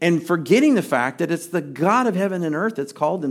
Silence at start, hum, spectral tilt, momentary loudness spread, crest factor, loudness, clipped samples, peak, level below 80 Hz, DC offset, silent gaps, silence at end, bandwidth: 0 s; none; -6 dB/octave; 8 LU; 16 dB; -20 LUFS; under 0.1%; -4 dBFS; -74 dBFS; under 0.1%; none; 0 s; 16 kHz